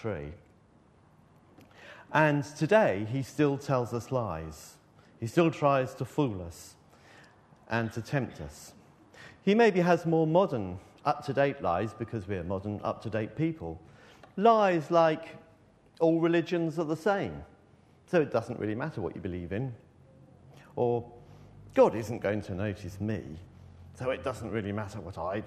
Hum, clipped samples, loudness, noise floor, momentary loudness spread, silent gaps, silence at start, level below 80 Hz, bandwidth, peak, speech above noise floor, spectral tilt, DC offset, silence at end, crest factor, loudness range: none; under 0.1%; -29 LUFS; -61 dBFS; 16 LU; none; 0 s; -60 dBFS; 13.5 kHz; -8 dBFS; 32 dB; -7 dB/octave; under 0.1%; 0 s; 22 dB; 7 LU